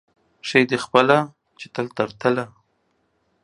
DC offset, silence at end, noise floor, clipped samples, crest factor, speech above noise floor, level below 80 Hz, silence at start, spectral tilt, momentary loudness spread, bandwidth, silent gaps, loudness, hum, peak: under 0.1%; 0.95 s; -68 dBFS; under 0.1%; 22 dB; 48 dB; -66 dBFS; 0.45 s; -5.5 dB/octave; 17 LU; 11.5 kHz; none; -20 LUFS; none; 0 dBFS